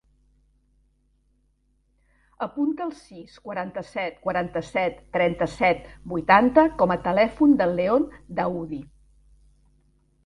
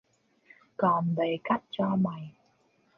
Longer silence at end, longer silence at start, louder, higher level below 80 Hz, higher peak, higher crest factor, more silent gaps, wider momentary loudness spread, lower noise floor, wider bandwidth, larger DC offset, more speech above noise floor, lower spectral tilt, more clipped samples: first, 1.4 s vs 0.65 s; first, 2.4 s vs 0.8 s; first, -23 LUFS vs -29 LUFS; first, -52 dBFS vs -70 dBFS; first, -2 dBFS vs -12 dBFS; about the same, 22 dB vs 18 dB; neither; about the same, 15 LU vs 17 LU; about the same, -67 dBFS vs -68 dBFS; first, 11 kHz vs 5.2 kHz; neither; first, 44 dB vs 40 dB; second, -7 dB/octave vs -9.5 dB/octave; neither